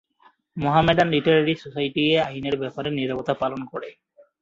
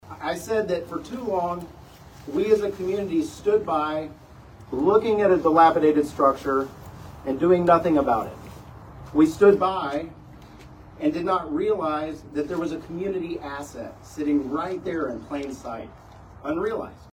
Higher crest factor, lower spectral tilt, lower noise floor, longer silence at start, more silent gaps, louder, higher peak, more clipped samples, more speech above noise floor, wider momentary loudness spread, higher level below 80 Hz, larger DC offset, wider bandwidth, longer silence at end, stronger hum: about the same, 20 dB vs 20 dB; about the same, -7 dB/octave vs -6.5 dB/octave; first, -59 dBFS vs -46 dBFS; first, 0.55 s vs 0.05 s; neither; about the same, -22 LUFS vs -23 LUFS; about the same, -4 dBFS vs -4 dBFS; neither; first, 37 dB vs 23 dB; second, 15 LU vs 19 LU; about the same, -52 dBFS vs -50 dBFS; neither; second, 7.6 kHz vs 16 kHz; first, 0.5 s vs 0.05 s; neither